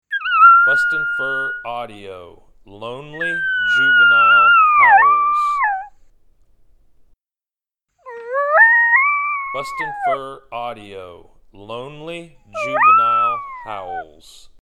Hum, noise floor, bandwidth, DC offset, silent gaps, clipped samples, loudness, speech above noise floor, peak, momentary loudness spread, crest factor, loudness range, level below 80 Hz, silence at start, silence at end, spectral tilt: none; under -90 dBFS; 11.5 kHz; under 0.1%; none; under 0.1%; -13 LUFS; over 72 dB; 0 dBFS; 23 LU; 16 dB; 11 LU; -54 dBFS; 0.1 s; 0.6 s; -3 dB/octave